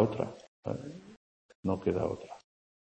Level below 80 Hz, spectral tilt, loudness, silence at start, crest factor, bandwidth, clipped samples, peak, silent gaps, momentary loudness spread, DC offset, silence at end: -62 dBFS; -8.5 dB/octave; -35 LUFS; 0 s; 22 dB; 8.6 kHz; under 0.1%; -12 dBFS; 0.48-0.63 s, 1.17-1.49 s, 1.55-1.63 s; 19 LU; under 0.1%; 0.45 s